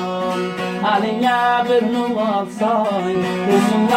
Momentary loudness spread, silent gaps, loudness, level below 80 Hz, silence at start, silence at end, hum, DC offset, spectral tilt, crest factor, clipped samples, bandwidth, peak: 6 LU; none; -18 LUFS; -58 dBFS; 0 s; 0 s; none; under 0.1%; -5.5 dB/octave; 14 dB; under 0.1%; 16 kHz; -2 dBFS